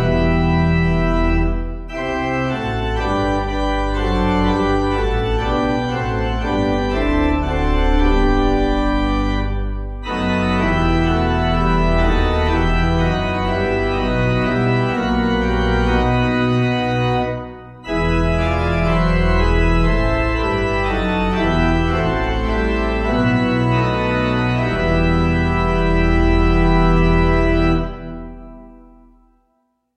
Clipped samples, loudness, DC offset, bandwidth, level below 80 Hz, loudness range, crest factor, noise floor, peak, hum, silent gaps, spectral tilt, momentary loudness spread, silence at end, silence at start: under 0.1%; -18 LUFS; under 0.1%; 8.4 kHz; -22 dBFS; 2 LU; 14 dB; -66 dBFS; -2 dBFS; none; none; -7.5 dB/octave; 5 LU; 1.2 s; 0 s